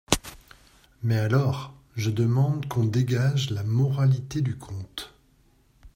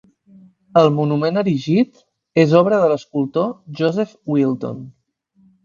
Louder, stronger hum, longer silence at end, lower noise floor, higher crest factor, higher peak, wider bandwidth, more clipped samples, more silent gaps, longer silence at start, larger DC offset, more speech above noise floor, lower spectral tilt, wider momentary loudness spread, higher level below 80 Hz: second, -25 LUFS vs -18 LUFS; neither; second, 0.05 s vs 0.75 s; about the same, -61 dBFS vs -59 dBFS; first, 24 dB vs 18 dB; about the same, 0 dBFS vs 0 dBFS; first, 16 kHz vs 7.4 kHz; neither; neither; second, 0.1 s vs 0.75 s; neither; second, 37 dB vs 42 dB; second, -6 dB/octave vs -8 dB/octave; first, 14 LU vs 10 LU; first, -50 dBFS vs -62 dBFS